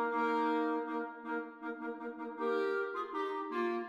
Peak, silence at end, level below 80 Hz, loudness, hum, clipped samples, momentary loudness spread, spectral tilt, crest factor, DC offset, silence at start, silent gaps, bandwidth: -22 dBFS; 0 s; -84 dBFS; -37 LUFS; none; under 0.1%; 10 LU; -5.5 dB/octave; 14 dB; under 0.1%; 0 s; none; 9.4 kHz